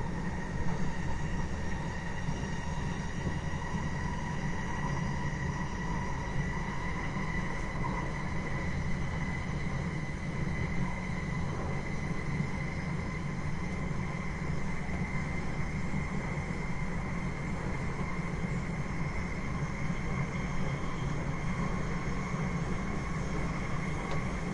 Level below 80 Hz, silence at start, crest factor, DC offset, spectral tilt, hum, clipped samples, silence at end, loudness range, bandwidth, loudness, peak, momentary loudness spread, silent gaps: -40 dBFS; 0 s; 14 dB; under 0.1%; -6.5 dB/octave; none; under 0.1%; 0 s; 1 LU; 11 kHz; -35 LUFS; -18 dBFS; 2 LU; none